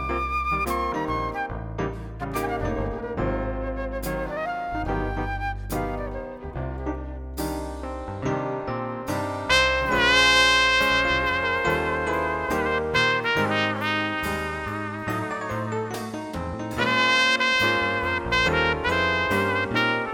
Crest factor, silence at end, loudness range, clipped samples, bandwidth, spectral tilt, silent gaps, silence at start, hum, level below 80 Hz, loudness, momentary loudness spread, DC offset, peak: 22 dB; 0 s; 11 LU; under 0.1%; over 20 kHz; -4 dB/octave; none; 0 s; none; -38 dBFS; -24 LUFS; 13 LU; under 0.1%; -4 dBFS